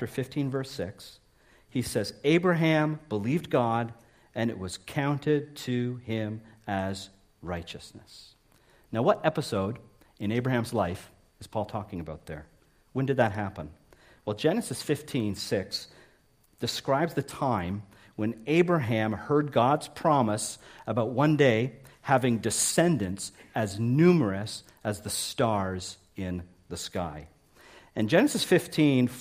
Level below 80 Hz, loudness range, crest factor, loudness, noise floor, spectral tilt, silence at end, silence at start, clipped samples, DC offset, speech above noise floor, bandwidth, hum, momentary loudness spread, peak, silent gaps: -60 dBFS; 7 LU; 20 dB; -28 LUFS; -63 dBFS; -5.5 dB/octave; 0 s; 0 s; under 0.1%; under 0.1%; 36 dB; 15.5 kHz; none; 16 LU; -8 dBFS; none